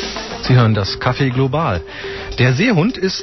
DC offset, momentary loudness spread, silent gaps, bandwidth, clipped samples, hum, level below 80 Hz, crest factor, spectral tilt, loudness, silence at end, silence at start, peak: 0.2%; 11 LU; none; 6.2 kHz; under 0.1%; none; -36 dBFS; 12 dB; -6.5 dB/octave; -16 LUFS; 0 s; 0 s; -4 dBFS